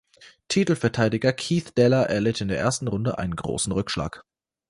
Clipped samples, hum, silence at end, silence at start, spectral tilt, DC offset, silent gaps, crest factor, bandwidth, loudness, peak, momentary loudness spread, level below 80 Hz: under 0.1%; none; 0.5 s; 0.2 s; -5.5 dB/octave; under 0.1%; none; 18 dB; 11.5 kHz; -24 LUFS; -6 dBFS; 8 LU; -48 dBFS